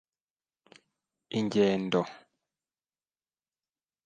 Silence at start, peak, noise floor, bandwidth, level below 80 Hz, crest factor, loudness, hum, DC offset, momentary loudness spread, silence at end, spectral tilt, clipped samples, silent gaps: 1.3 s; -12 dBFS; under -90 dBFS; 9.2 kHz; -74 dBFS; 22 dB; -29 LUFS; none; under 0.1%; 10 LU; 1.9 s; -6 dB/octave; under 0.1%; none